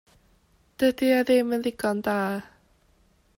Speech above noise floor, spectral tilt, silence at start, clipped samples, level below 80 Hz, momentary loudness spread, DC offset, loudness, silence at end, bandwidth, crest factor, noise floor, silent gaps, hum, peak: 39 dB; -5.5 dB/octave; 0.8 s; under 0.1%; -62 dBFS; 7 LU; under 0.1%; -24 LUFS; 0.95 s; 16.5 kHz; 16 dB; -63 dBFS; none; none; -10 dBFS